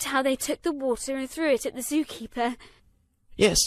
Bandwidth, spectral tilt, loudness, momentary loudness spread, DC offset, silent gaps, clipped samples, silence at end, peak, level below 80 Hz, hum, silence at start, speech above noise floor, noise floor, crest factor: 14 kHz; -2.5 dB/octave; -27 LUFS; 7 LU; under 0.1%; none; under 0.1%; 0 s; -6 dBFS; -48 dBFS; none; 0 s; 37 dB; -64 dBFS; 20 dB